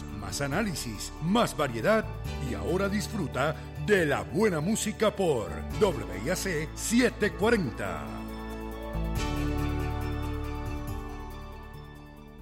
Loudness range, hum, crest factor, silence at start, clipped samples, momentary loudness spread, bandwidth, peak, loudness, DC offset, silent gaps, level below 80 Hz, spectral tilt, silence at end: 6 LU; none; 16 dB; 0 s; under 0.1%; 13 LU; 16 kHz; -14 dBFS; -29 LUFS; under 0.1%; none; -40 dBFS; -5 dB/octave; 0 s